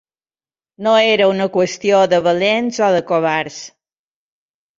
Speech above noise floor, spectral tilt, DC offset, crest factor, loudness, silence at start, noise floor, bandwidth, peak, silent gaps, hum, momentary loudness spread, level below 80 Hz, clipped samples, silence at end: over 75 dB; -4.5 dB/octave; under 0.1%; 16 dB; -15 LUFS; 0.8 s; under -90 dBFS; 7.8 kHz; -2 dBFS; none; none; 8 LU; -62 dBFS; under 0.1%; 1.1 s